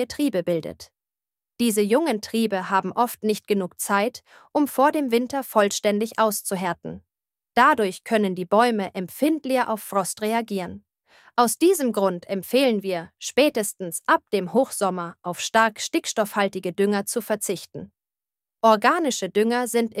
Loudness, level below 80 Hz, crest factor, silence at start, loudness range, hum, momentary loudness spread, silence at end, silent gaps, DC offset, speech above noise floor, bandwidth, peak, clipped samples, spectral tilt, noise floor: -23 LUFS; -66 dBFS; 20 dB; 0 s; 2 LU; none; 9 LU; 0 s; none; under 0.1%; over 67 dB; 16 kHz; -4 dBFS; under 0.1%; -4 dB/octave; under -90 dBFS